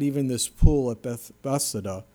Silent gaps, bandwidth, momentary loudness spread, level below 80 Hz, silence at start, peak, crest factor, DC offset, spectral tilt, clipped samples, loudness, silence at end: none; 19.5 kHz; 11 LU; -28 dBFS; 0 s; -2 dBFS; 22 dB; under 0.1%; -5.5 dB/octave; under 0.1%; -26 LUFS; 0.1 s